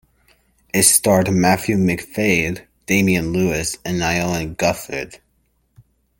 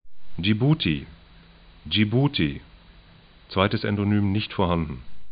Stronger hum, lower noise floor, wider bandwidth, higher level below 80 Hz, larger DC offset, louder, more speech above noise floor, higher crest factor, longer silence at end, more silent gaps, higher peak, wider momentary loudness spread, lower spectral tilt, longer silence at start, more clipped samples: neither; first, -64 dBFS vs -51 dBFS; first, 17 kHz vs 5.2 kHz; about the same, -46 dBFS vs -46 dBFS; neither; first, -18 LUFS vs -24 LUFS; first, 46 dB vs 28 dB; about the same, 20 dB vs 20 dB; first, 1.05 s vs 0 s; neither; first, 0 dBFS vs -4 dBFS; second, 12 LU vs 19 LU; second, -4 dB/octave vs -11 dB/octave; first, 0.75 s vs 0.05 s; neither